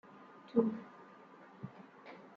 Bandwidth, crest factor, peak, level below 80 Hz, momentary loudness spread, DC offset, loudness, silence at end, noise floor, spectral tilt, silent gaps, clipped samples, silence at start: 5.4 kHz; 24 dB; -18 dBFS; -86 dBFS; 23 LU; under 0.1%; -36 LUFS; 0.1 s; -58 dBFS; -9.5 dB/octave; none; under 0.1%; 0.15 s